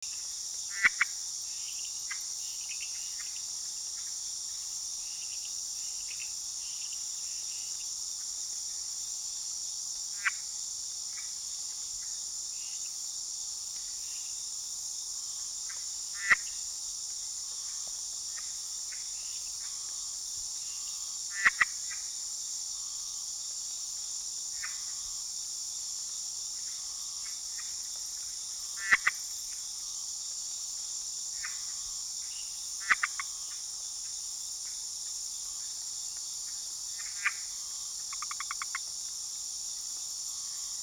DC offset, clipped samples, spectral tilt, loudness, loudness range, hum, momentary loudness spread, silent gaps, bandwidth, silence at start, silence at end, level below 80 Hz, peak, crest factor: under 0.1%; under 0.1%; 3.5 dB/octave; -34 LUFS; 3 LU; none; 6 LU; none; over 20 kHz; 0 s; 0 s; -68 dBFS; -12 dBFS; 26 dB